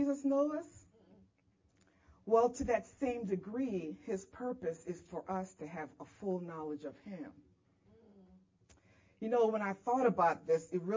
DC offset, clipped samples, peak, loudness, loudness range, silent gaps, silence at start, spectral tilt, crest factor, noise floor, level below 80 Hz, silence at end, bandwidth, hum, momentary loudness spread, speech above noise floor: under 0.1%; under 0.1%; -18 dBFS; -36 LUFS; 10 LU; none; 0 s; -7 dB/octave; 20 dB; -73 dBFS; -66 dBFS; 0 s; 7.6 kHz; none; 16 LU; 38 dB